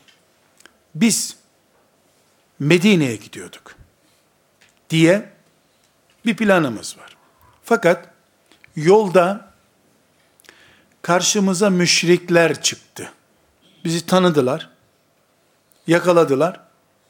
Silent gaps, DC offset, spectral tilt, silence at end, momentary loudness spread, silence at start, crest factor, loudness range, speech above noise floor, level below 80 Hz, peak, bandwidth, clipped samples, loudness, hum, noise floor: none; under 0.1%; -4.5 dB/octave; 0.55 s; 20 LU; 0.95 s; 20 dB; 4 LU; 44 dB; -66 dBFS; 0 dBFS; 17.5 kHz; under 0.1%; -17 LUFS; none; -61 dBFS